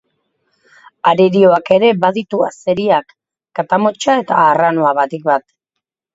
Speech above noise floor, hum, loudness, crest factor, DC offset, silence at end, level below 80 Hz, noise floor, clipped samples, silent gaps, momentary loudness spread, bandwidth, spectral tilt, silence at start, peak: 66 dB; none; -13 LUFS; 14 dB; under 0.1%; 0.75 s; -60 dBFS; -79 dBFS; under 0.1%; none; 7 LU; 8 kHz; -6 dB/octave; 1.05 s; 0 dBFS